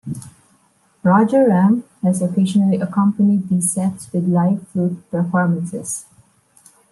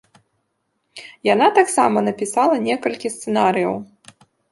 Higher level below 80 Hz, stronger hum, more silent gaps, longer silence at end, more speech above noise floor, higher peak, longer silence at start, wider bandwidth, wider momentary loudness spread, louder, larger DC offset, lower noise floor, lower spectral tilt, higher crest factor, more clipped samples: about the same, -62 dBFS vs -66 dBFS; neither; neither; first, 0.9 s vs 0.65 s; second, 41 dB vs 54 dB; about the same, -2 dBFS vs -2 dBFS; second, 0.05 s vs 0.95 s; about the same, 12.5 kHz vs 11.5 kHz; about the same, 10 LU vs 12 LU; about the same, -17 LUFS vs -18 LUFS; neither; second, -58 dBFS vs -71 dBFS; first, -7 dB/octave vs -4 dB/octave; about the same, 16 dB vs 18 dB; neither